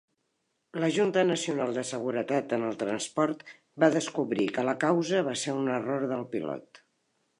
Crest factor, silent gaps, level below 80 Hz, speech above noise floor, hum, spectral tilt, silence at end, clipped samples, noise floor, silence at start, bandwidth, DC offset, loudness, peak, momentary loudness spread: 22 dB; none; -78 dBFS; 49 dB; none; -5 dB/octave; 0.6 s; under 0.1%; -78 dBFS; 0.75 s; 11.5 kHz; under 0.1%; -29 LUFS; -8 dBFS; 9 LU